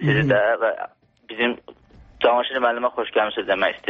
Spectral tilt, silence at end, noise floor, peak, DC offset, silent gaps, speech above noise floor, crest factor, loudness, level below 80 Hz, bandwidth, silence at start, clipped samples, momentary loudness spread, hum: -3.5 dB/octave; 0 s; -49 dBFS; -4 dBFS; under 0.1%; none; 28 dB; 16 dB; -21 LUFS; -54 dBFS; 6.8 kHz; 0 s; under 0.1%; 14 LU; none